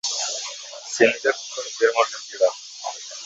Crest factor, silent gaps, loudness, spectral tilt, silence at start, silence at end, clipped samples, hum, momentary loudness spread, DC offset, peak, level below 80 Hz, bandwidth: 22 dB; none; -23 LUFS; -1 dB/octave; 0.05 s; 0 s; under 0.1%; none; 13 LU; under 0.1%; -2 dBFS; -70 dBFS; 8 kHz